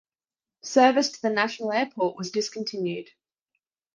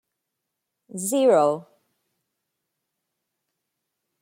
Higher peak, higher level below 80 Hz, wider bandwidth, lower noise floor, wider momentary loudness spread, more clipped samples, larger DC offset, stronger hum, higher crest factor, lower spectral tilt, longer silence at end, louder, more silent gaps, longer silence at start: about the same, -6 dBFS vs -8 dBFS; about the same, -74 dBFS vs -78 dBFS; second, 10 kHz vs 16.5 kHz; first, under -90 dBFS vs -82 dBFS; second, 12 LU vs 15 LU; neither; neither; neither; about the same, 22 dB vs 20 dB; about the same, -3.5 dB/octave vs -4.5 dB/octave; second, 0.9 s vs 2.6 s; second, -25 LUFS vs -21 LUFS; neither; second, 0.65 s vs 0.95 s